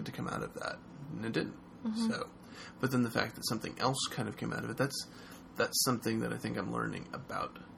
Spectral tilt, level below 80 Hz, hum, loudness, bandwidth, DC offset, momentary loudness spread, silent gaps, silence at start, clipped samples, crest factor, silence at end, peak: -4 dB/octave; -64 dBFS; none; -36 LUFS; 17 kHz; under 0.1%; 13 LU; none; 0 s; under 0.1%; 22 dB; 0 s; -14 dBFS